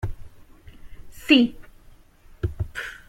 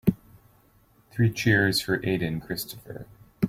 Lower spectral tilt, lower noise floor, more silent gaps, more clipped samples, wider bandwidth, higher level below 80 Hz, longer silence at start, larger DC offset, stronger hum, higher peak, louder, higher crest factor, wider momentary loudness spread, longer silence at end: about the same, -5.5 dB/octave vs -5.5 dB/octave; second, -50 dBFS vs -60 dBFS; neither; neither; about the same, 16 kHz vs 16.5 kHz; first, -42 dBFS vs -52 dBFS; about the same, 0 s vs 0.05 s; neither; neither; about the same, -4 dBFS vs -6 dBFS; first, -22 LUFS vs -25 LUFS; about the same, 24 dB vs 20 dB; second, 17 LU vs 20 LU; about the same, 0.1 s vs 0 s